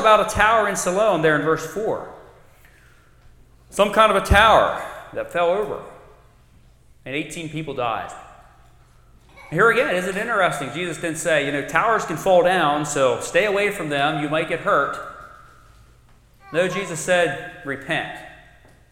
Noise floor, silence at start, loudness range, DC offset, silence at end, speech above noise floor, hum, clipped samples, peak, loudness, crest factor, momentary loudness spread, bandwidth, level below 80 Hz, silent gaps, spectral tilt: -52 dBFS; 0 s; 8 LU; under 0.1%; 0.6 s; 32 dB; none; under 0.1%; 0 dBFS; -20 LUFS; 22 dB; 15 LU; 16.5 kHz; -40 dBFS; none; -4 dB/octave